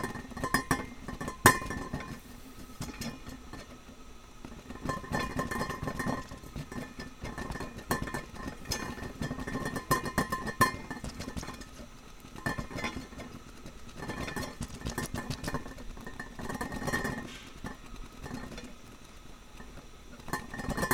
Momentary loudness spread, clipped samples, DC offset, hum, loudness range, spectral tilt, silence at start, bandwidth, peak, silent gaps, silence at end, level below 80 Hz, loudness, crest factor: 19 LU; under 0.1%; under 0.1%; none; 8 LU; -4 dB/octave; 0 s; over 20 kHz; -2 dBFS; none; 0 s; -48 dBFS; -35 LUFS; 34 dB